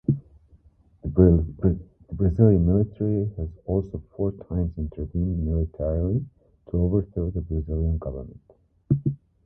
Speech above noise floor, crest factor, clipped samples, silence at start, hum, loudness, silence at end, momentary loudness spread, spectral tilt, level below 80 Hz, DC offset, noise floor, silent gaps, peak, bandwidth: 33 dB; 22 dB; under 0.1%; 0.1 s; none; -25 LUFS; 0.3 s; 14 LU; -14.5 dB/octave; -32 dBFS; under 0.1%; -56 dBFS; none; -2 dBFS; 1.8 kHz